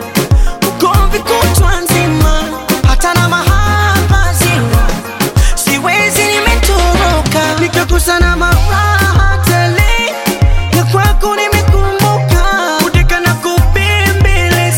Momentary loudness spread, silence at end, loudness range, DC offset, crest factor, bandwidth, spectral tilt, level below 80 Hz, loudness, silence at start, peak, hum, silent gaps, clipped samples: 3 LU; 0 s; 1 LU; under 0.1%; 10 dB; 17 kHz; -4.5 dB/octave; -14 dBFS; -11 LUFS; 0 s; 0 dBFS; none; none; under 0.1%